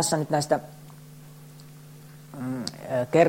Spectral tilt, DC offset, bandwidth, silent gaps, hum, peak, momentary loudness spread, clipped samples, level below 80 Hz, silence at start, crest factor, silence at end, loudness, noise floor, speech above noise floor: -4.5 dB/octave; under 0.1%; 16.5 kHz; none; none; -6 dBFS; 22 LU; under 0.1%; -64 dBFS; 0 s; 20 dB; 0 s; -28 LUFS; -46 dBFS; 22 dB